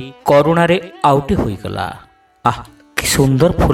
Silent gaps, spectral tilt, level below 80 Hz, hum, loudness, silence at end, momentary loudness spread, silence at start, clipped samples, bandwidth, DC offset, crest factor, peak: none; -5.5 dB/octave; -32 dBFS; none; -15 LUFS; 0 s; 12 LU; 0 s; under 0.1%; 17.5 kHz; under 0.1%; 16 dB; 0 dBFS